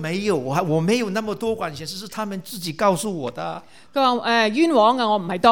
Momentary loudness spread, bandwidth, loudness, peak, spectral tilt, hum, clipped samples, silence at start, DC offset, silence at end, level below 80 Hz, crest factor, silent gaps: 13 LU; 18 kHz; -21 LUFS; 0 dBFS; -5 dB/octave; none; under 0.1%; 0 s; 0.4%; 0 s; -60 dBFS; 20 dB; none